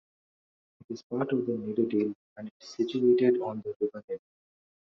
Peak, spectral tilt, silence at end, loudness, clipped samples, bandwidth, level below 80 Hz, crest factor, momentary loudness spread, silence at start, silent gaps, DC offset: -12 dBFS; -6.5 dB/octave; 0.7 s; -29 LUFS; under 0.1%; 6.8 kHz; -74 dBFS; 18 dB; 19 LU; 0.9 s; 1.04-1.10 s, 2.15-2.36 s, 2.51-2.60 s, 3.76-3.80 s, 4.04-4.08 s; under 0.1%